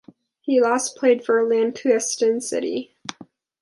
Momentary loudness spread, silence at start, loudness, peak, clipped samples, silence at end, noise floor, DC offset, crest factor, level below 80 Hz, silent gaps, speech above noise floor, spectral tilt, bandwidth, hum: 15 LU; 0.45 s; -21 LUFS; -6 dBFS; under 0.1%; 0.4 s; -48 dBFS; under 0.1%; 16 dB; -74 dBFS; none; 28 dB; -2.5 dB/octave; 11.5 kHz; none